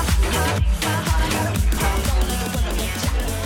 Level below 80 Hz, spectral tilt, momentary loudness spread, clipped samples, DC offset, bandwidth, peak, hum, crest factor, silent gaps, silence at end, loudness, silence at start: -22 dBFS; -4.5 dB/octave; 3 LU; under 0.1%; under 0.1%; 18 kHz; -8 dBFS; none; 12 dB; none; 0 s; -21 LUFS; 0 s